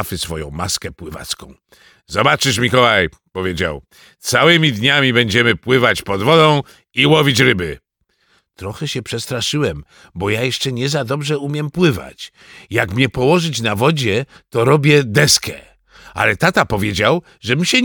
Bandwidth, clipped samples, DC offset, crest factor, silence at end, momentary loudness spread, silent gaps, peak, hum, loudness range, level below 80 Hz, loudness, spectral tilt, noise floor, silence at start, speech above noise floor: 19 kHz; under 0.1%; under 0.1%; 16 dB; 0 s; 15 LU; none; 0 dBFS; none; 7 LU; -44 dBFS; -15 LUFS; -4 dB/octave; -62 dBFS; 0 s; 46 dB